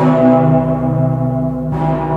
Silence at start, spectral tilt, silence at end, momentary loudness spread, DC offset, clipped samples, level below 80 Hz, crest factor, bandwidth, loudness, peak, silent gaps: 0 s; -10.5 dB/octave; 0 s; 8 LU; under 0.1%; under 0.1%; -36 dBFS; 12 dB; 4.4 kHz; -14 LUFS; 0 dBFS; none